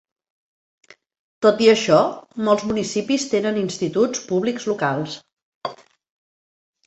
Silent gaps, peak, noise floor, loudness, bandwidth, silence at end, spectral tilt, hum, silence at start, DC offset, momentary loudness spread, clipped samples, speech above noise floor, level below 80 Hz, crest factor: 5.33-5.61 s; -2 dBFS; under -90 dBFS; -20 LUFS; 8.2 kHz; 1.1 s; -4.5 dB/octave; none; 1.4 s; under 0.1%; 17 LU; under 0.1%; over 71 dB; -62 dBFS; 20 dB